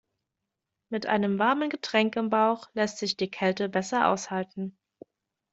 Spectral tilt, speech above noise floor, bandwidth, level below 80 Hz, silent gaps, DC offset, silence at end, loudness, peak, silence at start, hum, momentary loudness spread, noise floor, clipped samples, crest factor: -4.5 dB/octave; 58 dB; 8 kHz; -70 dBFS; none; under 0.1%; 0.8 s; -27 LUFS; -8 dBFS; 0.9 s; none; 9 LU; -85 dBFS; under 0.1%; 20 dB